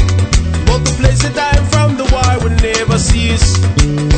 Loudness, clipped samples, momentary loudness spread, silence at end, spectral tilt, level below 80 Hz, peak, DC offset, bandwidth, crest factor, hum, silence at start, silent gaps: -12 LUFS; under 0.1%; 2 LU; 0 s; -5 dB/octave; -16 dBFS; 0 dBFS; under 0.1%; 9.2 kHz; 10 dB; none; 0 s; none